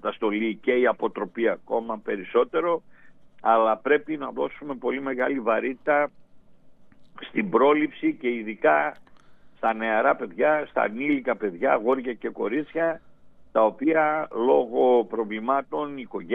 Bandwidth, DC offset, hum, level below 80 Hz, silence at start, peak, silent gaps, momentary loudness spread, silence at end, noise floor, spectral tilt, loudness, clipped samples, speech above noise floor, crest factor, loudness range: 3.9 kHz; under 0.1%; none; -66 dBFS; 0.05 s; -6 dBFS; none; 10 LU; 0 s; -49 dBFS; -8 dB/octave; -24 LUFS; under 0.1%; 25 dB; 18 dB; 2 LU